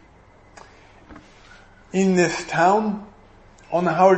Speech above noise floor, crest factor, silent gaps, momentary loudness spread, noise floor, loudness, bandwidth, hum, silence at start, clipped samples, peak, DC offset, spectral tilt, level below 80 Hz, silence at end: 33 dB; 20 dB; none; 10 LU; -51 dBFS; -21 LUFS; 8.6 kHz; none; 1.1 s; under 0.1%; -2 dBFS; under 0.1%; -6 dB/octave; -54 dBFS; 0 s